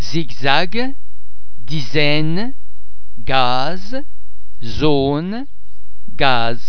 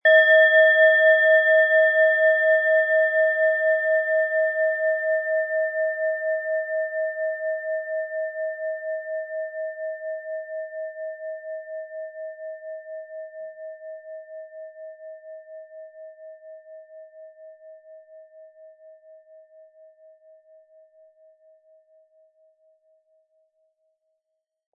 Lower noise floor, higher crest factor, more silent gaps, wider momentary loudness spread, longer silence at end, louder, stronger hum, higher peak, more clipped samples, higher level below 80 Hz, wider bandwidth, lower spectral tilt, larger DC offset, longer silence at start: second, -47 dBFS vs -81 dBFS; about the same, 20 dB vs 18 dB; neither; second, 14 LU vs 25 LU; second, 0 s vs 5.85 s; about the same, -19 LUFS vs -20 LUFS; neither; first, 0 dBFS vs -6 dBFS; neither; first, -38 dBFS vs under -90 dBFS; first, 5.4 kHz vs 3.6 kHz; first, -6 dB/octave vs -1.5 dB/octave; first, 30% vs under 0.1%; about the same, 0 s vs 0.05 s